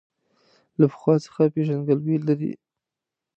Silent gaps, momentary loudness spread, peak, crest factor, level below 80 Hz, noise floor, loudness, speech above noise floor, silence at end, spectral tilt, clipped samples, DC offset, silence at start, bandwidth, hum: none; 11 LU; -6 dBFS; 18 dB; -72 dBFS; -87 dBFS; -23 LUFS; 65 dB; 0.8 s; -9.5 dB/octave; under 0.1%; under 0.1%; 0.8 s; 8 kHz; none